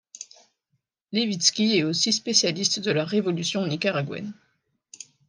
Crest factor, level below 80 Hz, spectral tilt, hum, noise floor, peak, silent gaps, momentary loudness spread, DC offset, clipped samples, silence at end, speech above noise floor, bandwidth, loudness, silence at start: 22 dB; -74 dBFS; -3 dB/octave; none; -76 dBFS; -4 dBFS; none; 21 LU; under 0.1%; under 0.1%; 0.95 s; 52 dB; 10.5 kHz; -23 LUFS; 0.15 s